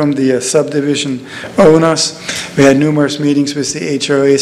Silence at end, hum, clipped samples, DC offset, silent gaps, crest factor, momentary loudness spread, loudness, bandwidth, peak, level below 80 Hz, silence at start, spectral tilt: 0 s; none; 0.6%; under 0.1%; none; 12 dB; 9 LU; -12 LUFS; 13.5 kHz; 0 dBFS; -46 dBFS; 0 s; -4.5 dB/octave